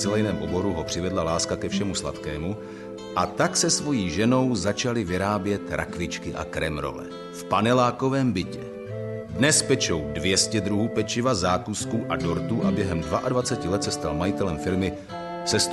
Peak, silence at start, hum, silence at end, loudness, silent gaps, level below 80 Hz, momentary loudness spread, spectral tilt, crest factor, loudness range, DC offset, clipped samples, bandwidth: -8 dBFS; 0 s; none; 0 s; -25 LUFS; none; -46 dBFS; 11 LU; -4 dB/octave; 18 dB; 3 LU; under 0.1%; under 0.1%; 12.5 kHz